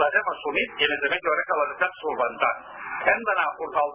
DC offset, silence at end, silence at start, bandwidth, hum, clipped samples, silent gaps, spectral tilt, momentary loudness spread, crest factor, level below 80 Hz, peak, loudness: under 0.1%; 0 s; 0 s; 3.7 kHz; none; under 0.1%; none; -6 dB/octave; 4 LU; 22 dB; -62 dBFS; -2 dBFS; -24 LUFS